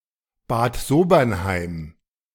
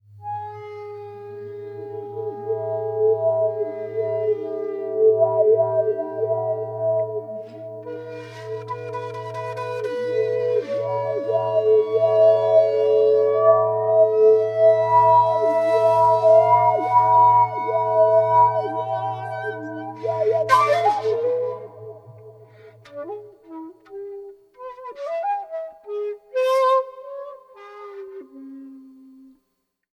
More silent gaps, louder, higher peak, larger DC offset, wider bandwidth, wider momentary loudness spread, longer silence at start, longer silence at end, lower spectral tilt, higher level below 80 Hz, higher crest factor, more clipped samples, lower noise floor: neither; about the same, -20 LUFS vs -19 LUFS; about the same, -4 dBFS vs -4 dBFS; neither; first, 18 kHz vs 11 kHz; second, 16 LU vs 21 LU; first, 0.5 s vs 0.15 s; second, 0.45 s vs 1.05 s; about the same, -6.5 dB/octave vs -6.5 dB/octave; first, -42 dBFS vs -76 dBFS; about the same, 18 dB vs 18 dB; neither; second, -52 dBFS vs -75 dBFS